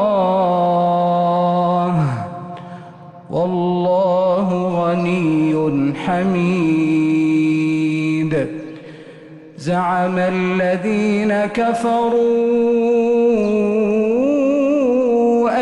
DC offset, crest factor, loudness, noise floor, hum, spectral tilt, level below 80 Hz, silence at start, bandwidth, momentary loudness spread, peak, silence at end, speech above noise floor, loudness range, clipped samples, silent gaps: under 0.1%; 10 dB; -17 LUFS; -38 dBFS; none; -8 dB/octave; -54 dBFS; 0 s; 11 kHz; 6 LU; -6 dBFS; 0 s; 22 dB; 4 LU; under 0.1%; none